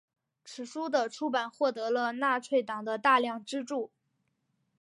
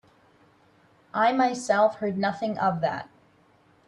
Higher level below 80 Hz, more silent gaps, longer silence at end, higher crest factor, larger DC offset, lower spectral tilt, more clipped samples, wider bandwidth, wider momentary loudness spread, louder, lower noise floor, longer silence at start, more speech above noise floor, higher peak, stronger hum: second, -88 dBFS vs -70 dBFS; neither; first, 0.95 s vs 0.8 s; about the same, 20 dB vs 18 dB; neither; second, -3 dB/octave vs -5.5 dB/octave; neither; about the same, 11.5 kHz vs 11 kHz; about the same, 13 LU vs 11 LU; second, -30 LUFS vs -25 LUFS; first, -78 dBFS vs -60 dBFS; second, 0.45 s vs 1.15 s; first, 48 dB vs 36 dB; second, -12 dBFS vs -8 dBFS; neither